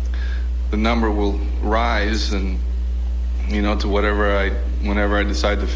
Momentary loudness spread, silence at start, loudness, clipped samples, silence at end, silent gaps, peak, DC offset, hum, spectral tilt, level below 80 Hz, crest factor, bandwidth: 6 LU; 0 s; -21 LUFS; under 0.1%; 0 s; none; -4 dBFS; under 0.1%; none; -6 dB/octave; -20 dBFS; 14 dB; 7.6 kHz